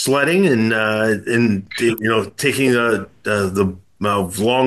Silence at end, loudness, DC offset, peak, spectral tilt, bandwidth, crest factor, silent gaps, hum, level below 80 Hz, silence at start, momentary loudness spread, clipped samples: 0 s; -18 LUFS; 0.2%; -2 dBFS; -5 dB/octave; 13.5 kHz; 14 dB; none; none; -56 dBFS; 0 s; 6 LU; under 0.1%